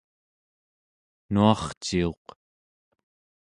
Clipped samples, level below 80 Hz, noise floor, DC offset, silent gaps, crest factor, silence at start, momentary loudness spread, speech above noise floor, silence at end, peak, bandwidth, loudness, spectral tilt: under 0.1%; -50 dBFS; under -90 dBFS; under 0.1%; 1.77-1.81 s; 24 dB; 1.3 s; 9 LU; over 66 dB; 1.35 s; -4 dBFS; 11 kHz; -25 LUFS; -6 dB/octave